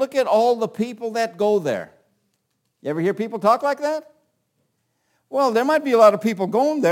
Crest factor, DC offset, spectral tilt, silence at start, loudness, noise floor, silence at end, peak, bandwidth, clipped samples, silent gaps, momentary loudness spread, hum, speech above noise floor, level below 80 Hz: 20 dB; under 0.1%; -5.5 dB/octave; 0 s; -20 LUFS; -72 dBFS; 0 s; -2 dBFS; 17 kHz; under 0.1%; none; 12 LU; none; 53 dB; -74 dBFS